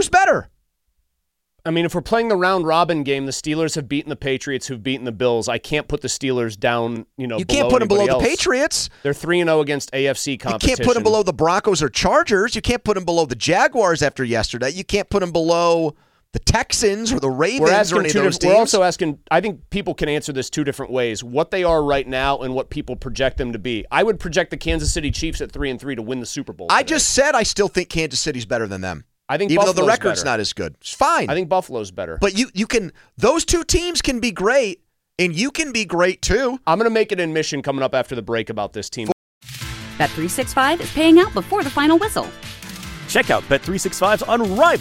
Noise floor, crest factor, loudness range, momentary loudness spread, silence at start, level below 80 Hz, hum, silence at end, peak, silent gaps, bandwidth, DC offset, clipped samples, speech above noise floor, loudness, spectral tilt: -75 dBFS; 18 dB; 5 LU; 10 LU; 0 s; -36 dBFS; none; 0 s; -2 dBFS; 39.12-39.41 s; 16.5 kHz; under 0.1%; under 0.1%; 57 dB; -19 LUFS; -4 dB/octave